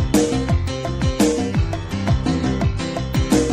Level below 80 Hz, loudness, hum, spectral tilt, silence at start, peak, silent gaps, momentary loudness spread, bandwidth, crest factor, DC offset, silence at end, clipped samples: -28 dBFS; -20 LUFS; none; -6 dB/octave; 0 s; -4 dBFS; none; 6 LU; 16 kHz; 14 dB; 0.5%; 0 s; under 0.1%